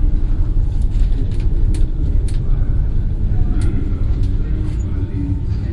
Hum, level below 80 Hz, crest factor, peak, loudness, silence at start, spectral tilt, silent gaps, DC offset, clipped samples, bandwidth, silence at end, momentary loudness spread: none; -16 dBFS; 12 dB; -4 dBFS; -21 LUFS; 0 s; -8.5 dB/octave; none; under 0.1%; under 0.1%; 9.8 kHz; 0 s; 2 LU